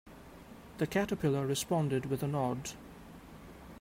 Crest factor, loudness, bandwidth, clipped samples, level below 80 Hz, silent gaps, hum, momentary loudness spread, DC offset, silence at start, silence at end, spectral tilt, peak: 18 dB; -34 LUFS; 16 kHz; under 0.1%; -60 dBFS; none; none; 20 LU; under 0.1%; 0.05 s; 0 s; -5.5 dB/octave; -18 dBFS